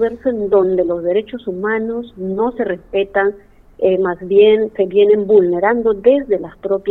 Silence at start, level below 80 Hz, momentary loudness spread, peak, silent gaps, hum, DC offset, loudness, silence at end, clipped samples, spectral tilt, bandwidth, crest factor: 0 s; -48 dBFS; 9 LU; 0 dBFS; none; none; under 0.1%; -16 LUFS; 0 s; under 0.1%; -8.5 dB/octave; 4 kHz; 14 dB